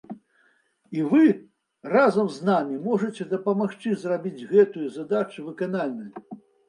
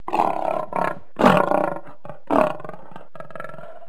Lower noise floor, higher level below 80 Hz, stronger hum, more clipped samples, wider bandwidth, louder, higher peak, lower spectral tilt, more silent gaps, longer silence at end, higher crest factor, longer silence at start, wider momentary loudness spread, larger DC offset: first, -65 dBFS vs -42 dBFS; second, -76 dBFS vs -52 dBFS; neither; neither; second, 10.5 kHz vs 15.5 kHz; second, -24 LUFS vs -21 LUFS; second, -6 dBFS vs 0 dBFS; about the same, -7.5 dB/octave vs -6.5 dB/octave; neither; first, 0.3 s vs 0.1 s; about the same, 18 dB vs 22 dB; about the same, 0.1 s vs 0.1 s; second, 16 LU vs 23 LU; second, under 0.1% vs 3%